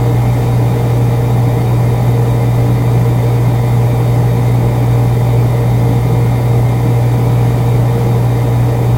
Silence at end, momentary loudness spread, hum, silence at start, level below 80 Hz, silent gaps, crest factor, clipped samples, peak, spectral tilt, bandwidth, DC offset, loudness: 0 s; 1 LU; none; 0 s; -26 dBFS; none; 10 dB; under 0.1%; 0 dBFS; -8 dB/octave; 16 kHz; under 0.1%; -12 LUFS